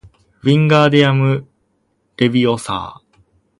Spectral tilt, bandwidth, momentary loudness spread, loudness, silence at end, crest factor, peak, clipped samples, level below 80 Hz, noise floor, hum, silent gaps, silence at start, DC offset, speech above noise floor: -6.5 dB/octave; 11.5 kHz; 12 LU; -15 LUFS; 0.65 s; 16 dB; 0 dBFS; under 0.1%; -52 dBFS; -64 dBFS; none; none; 0.45 s; under 0.1%; 51 dB